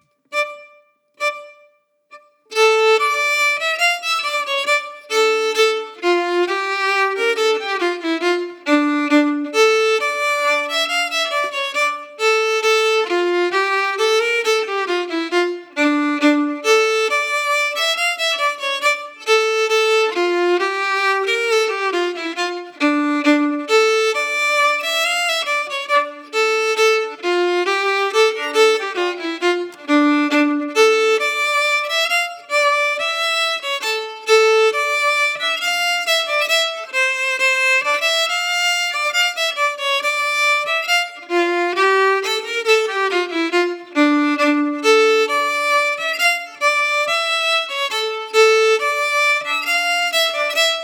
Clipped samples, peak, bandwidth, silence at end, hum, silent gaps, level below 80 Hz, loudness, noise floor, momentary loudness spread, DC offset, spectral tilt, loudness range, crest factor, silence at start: under 0.1%; -2 dBFS; 19 kHz; 0 s; none; none; -90 dBFS; -17 LUFS; -56 dBFS; 6 LU; under 0.1%; 0.5 dB/octave; 2 LU; 16 dB; 0.3 s